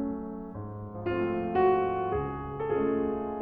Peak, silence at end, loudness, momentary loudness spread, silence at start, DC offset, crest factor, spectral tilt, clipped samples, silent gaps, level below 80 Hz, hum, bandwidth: -14 dBFS; 0 s; -30 LUFS; 14 LU; 0 s; under 0.1%; 16 dB; -11 dB/octave; under 0.1%; none; -50 dBFS; none; 4.6 kHz